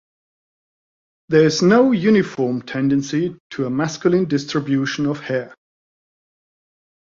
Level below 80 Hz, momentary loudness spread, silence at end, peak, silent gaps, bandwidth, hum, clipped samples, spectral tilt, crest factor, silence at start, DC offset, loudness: -60 dBFS; 11 LU; 1.7 s; -2 dBFS; 3.40-3.50 s; 7.6 kHz; none; under 0.1%; -6 dB/octave; 18 dB; 1.3 s; under 0.1%; -18 LUFS